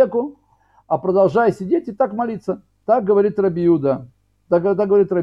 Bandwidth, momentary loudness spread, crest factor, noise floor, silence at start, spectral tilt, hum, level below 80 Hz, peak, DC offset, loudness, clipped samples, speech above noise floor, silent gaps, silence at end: 7.6 kHz; 10 LU; 14 dB; -57 dBFS; 0 s; -9.5 dB/octave; none; -58 dBFS; -4 dBFS; under 0.1%; -18 LUFS; under 0.1%; 40 dB; none; 0 s